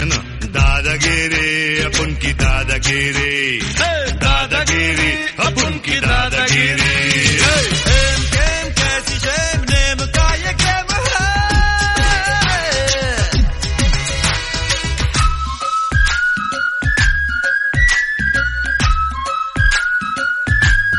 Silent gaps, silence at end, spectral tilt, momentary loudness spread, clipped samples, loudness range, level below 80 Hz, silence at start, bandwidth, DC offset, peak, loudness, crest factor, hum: none; 0 s; -3 dB/octave; 5 LU; under 0.1%; 3 LU; -20 dBFS; 0 s; 11.5 kHz; under 0.1%; 0 dBFS; -15 LUFS; 16 dB; none